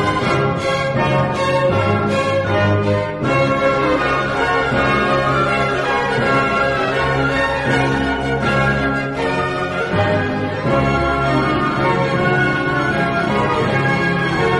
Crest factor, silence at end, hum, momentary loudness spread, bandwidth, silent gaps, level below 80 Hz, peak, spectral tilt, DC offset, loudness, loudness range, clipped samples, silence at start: 14 dB; 0 s; none; 3 LU; 11.5 kHz; none; -36 dBFS; -2 dBFS; -6.5 dB/octave; under 0.1%; -17 LUFS; 1 LU; under 0.1%; 0 s